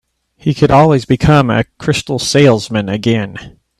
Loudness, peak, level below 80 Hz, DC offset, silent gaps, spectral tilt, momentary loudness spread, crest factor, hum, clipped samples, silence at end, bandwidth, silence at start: -12 LUFS; 0 dBFS; -36 dBFS; under 0.1%; none; -6 dB/octave; 10 LU; 12 dB; none; under 0.1%; 0.3 s; 13 kHz; 0.45 s